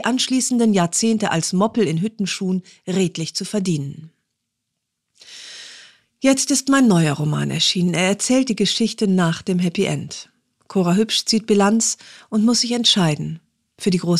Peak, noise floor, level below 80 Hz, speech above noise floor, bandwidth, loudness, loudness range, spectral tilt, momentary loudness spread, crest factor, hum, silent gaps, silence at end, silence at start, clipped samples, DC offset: -4 dBFS; -78 dBFS; -62 dBFS; 59 dB; 14 kHz; -18 LUFS; 8 LU; -4 dB/octave; 12 LU; 16 dB; none; none; 0 s; 0 s; under 0.1%; under 0.1%